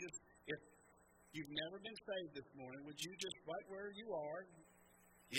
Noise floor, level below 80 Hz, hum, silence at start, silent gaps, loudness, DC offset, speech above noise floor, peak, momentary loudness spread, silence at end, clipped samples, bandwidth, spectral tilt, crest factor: -70 dBFS; -80 dBFS; none; 0 s; none; -49 LUFS; under 0.1%; 21 dB; -24 dBFS; 22 LU; 0 s; under 0.1%; 16 kHz; -3 dB/octave; 28 dB